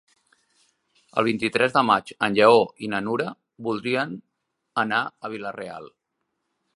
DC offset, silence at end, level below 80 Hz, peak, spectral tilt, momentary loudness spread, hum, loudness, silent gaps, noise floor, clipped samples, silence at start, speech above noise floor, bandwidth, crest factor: under 0.1%; 0.85 s; -68 dBFS; -2 dBFS; -5.5 dB/octave; 16 LU; none; -23 LUFS; none; -78 dBFS; under 0.1%; 1.15 s; 56 dB; 11.5 kHz; 22 dB